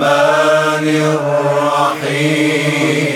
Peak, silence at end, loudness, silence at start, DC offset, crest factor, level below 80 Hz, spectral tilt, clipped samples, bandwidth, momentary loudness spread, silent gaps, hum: 0 dBFS; 0 s; -13 LUFS; 0 s; under 0.1%; 12 dB; -68 dBFS; -5 dB/octave; under 0.1%; 18 kHz; 4 LU; none; none